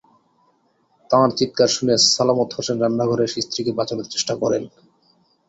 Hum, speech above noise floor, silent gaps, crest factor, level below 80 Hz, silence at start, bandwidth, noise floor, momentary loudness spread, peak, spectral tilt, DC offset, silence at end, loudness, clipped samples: none; 43 dB; none; 20 dB; -60 dBFS; 1.1 s; 8.2 kHz; -63 dBFS; 9 LU; -2 dBFS; -3.5 dB/octave; under 0.1%; 0.8 s; -19 LUFS; under 0.1%